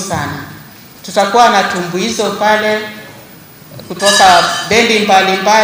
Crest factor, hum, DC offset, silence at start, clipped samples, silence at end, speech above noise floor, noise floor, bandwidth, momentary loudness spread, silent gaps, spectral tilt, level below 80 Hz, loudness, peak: 12 dB; none; under 0.1%; 0 s; 0.1%; 0 s; 25 dB; -36 dBFS; 16.5 kHz; 19 LU; none; -2.5 dB/octave; -48 dBFS; -10 LUFS; 0 dBFS